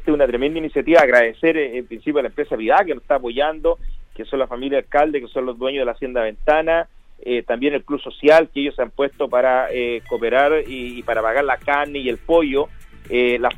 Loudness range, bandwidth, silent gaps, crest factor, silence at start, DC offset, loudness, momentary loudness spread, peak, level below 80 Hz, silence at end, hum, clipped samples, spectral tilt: 4 LU; 11.5 kHz; none; 16 dB; 0 s; under 0.1%; -19 LUFS; 10 LU; -2 dBFS; -38 dBFS; 0 s; none; under 0.1%; -5.5 dB/octave